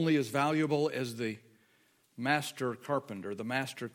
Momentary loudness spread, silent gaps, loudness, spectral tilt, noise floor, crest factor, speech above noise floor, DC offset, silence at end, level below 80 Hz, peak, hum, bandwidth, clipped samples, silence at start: 9 LU; none; -33 LUFS; -5.5 dB/octave; -69 dBFS; 20 dB; 37 dB; under 0.1%; 0.05 s; -80 dBFS; -14 dBFS; none; 17 kHz; under 0.1%; 0 s